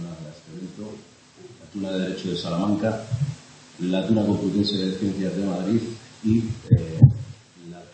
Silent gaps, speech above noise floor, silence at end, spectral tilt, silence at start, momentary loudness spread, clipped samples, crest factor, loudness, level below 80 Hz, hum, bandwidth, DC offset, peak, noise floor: none; 24 dB; 0.1 s; -7.5 dB/octave; 0 s; 20 LU; under 0.1%; 24 dB; -23 LUFS; -48 dBFS; none; 8.8 kHz; under 0.1%; 0 dBFS; -48 dBFS